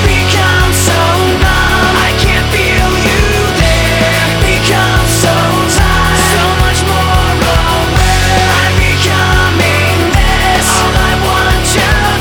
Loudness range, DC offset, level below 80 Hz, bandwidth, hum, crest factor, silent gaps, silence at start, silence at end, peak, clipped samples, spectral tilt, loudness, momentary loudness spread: 0 LU; under 0.1%; -16 dBFS; over 20 kHz; none; 8 dB; none; 0 s; 0 s; 0 dBFS; under 0.1%; -4 dB/octave; -9 LUFS; 1 LU